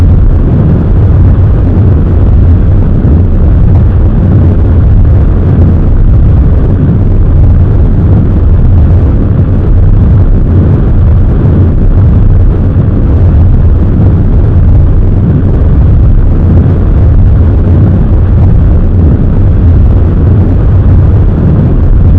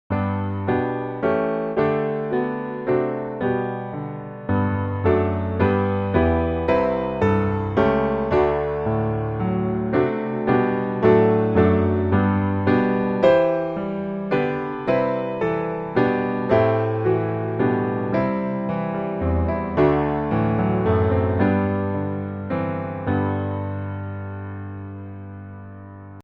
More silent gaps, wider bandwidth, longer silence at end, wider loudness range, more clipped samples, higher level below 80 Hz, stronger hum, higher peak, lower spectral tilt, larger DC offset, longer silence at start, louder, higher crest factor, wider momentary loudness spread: neither; second, 3.5 kHz vs 5.6 kHz; about the same, 0 s vs 0 s; second, 0 LU vs 5 LU; first, 10% vs under 0.1%; first, -6 dBFS vs -42 dBFS; neither; first, 0 dBFS vs -4 dBFS; first, -12 dB/octave vs -10 dB/octave; first, 1% vs under 0.1%; about the same, 0 s vs 0.1 s; first, -6 LUFS vs -22 LUFS; second, 4 dB vs 18 dB; second, 2 LU vs 11 LU